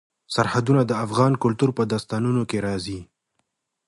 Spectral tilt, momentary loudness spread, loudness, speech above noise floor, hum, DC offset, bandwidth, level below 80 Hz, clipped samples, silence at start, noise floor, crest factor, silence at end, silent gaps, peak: -6.5 dB/octave; 9 LU; -22 LUFS; 53 dB; none; under 0.1%; 11.5 kHz; -54 dBFS; under 0.1%; 0.3 s; -75 dBFS; 18 dB; 0.85 s; none; -4 dBFS